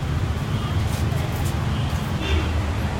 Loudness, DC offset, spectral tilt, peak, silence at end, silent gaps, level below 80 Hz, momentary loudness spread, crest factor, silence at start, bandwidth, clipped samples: -24 LUFS; under 0.1%; -6 dB/octave; -10 dBFS; 0 s; none; -30 dBFS; 2 LU; 12 dB; 0 s; 16.5 kHz; under 0.1%